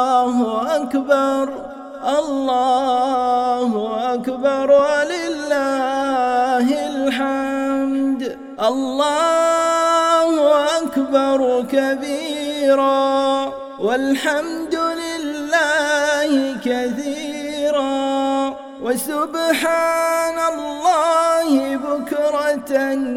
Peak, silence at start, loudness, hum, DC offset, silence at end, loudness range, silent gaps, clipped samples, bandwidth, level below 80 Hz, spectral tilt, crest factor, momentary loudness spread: -2 dBFS; 0 s; -18 LUFS; none; under 0.1%; 0 s; 3 LU; none; under 0.1%; 17.5 kHz; -58 dBFS; -3 dB/octave; 16 dB; 8 LU